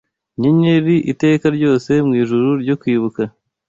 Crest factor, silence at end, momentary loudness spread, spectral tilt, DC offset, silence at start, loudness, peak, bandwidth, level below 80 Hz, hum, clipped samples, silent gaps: 12 dB; 0.4 s; 8 LU; -8 dB/octave; under 0.1%; 0.4 s; -16 LUFS; -2 dBFS; 7.6 kHz; -54 dBFS; none; under 0.1%; none